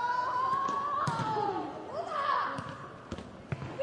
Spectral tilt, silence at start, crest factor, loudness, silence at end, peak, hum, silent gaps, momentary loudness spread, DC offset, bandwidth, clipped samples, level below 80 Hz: -5.5 dB/octave; 0 s; 16 dB; -33 LUFS; 0 s; -18 dBFS; none; none; 13 LU; under 0.1%; 11.5 kHz; under 0.1%; -64 dBFS